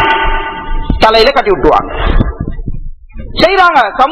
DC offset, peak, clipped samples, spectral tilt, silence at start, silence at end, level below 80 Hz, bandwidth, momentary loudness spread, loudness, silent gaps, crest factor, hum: under 0.1%; 0 dBFS; 2%; -6 dB/octave; 0 s; 0 s; -18 dBFS; 6 kHz; 15 LU; -10 LUFS; none; 10 dB; none